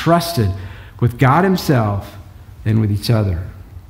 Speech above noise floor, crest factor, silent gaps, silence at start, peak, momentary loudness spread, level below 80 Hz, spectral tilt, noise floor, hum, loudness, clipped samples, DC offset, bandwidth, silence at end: 21 dB; 16 dB; none; 0 s; 0 dBFS; 15 LU; -38 dBFS; -7 dB/octave; -36 dBFS; none; -17 LUFS; under 0.1%; under 0.1%; 16.5 kHz; 0.1 s